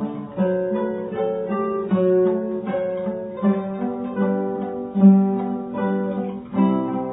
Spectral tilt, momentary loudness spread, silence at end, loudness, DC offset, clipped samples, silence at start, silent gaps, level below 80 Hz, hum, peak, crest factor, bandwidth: -13 dB/octave; 10 LU; 0 s; -22 LUFS; under 0.1%; under 0.1%; 0 s; none; -58 dBFS; none; -4 dBFS; 18 dB; 3.9 kHz